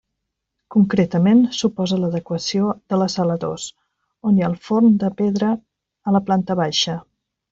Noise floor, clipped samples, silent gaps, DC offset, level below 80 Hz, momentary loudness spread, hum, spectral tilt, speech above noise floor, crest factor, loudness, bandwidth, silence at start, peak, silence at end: -78 dBFS; under 0.1%; none; under 0.1%; -58 dBFS; 11 LU; none; -6 dB/octave; 60 dB; 14 dB; -19 LUFS; 7.8 kHz; 0.7 s; -4 dBFS; 0.5 s